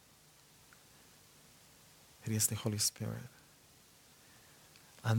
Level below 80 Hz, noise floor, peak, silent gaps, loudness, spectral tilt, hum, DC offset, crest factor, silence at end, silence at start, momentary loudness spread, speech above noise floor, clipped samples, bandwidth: -74 dBFS; -64 dBFS; -18 dBFS; none; -36 LUFS; -3.5 dB/octave; none; under 0.1%; 24 dB; 0 s; 2.2 s; 27 LU; 27 dB; under 0.1%; 19 kHz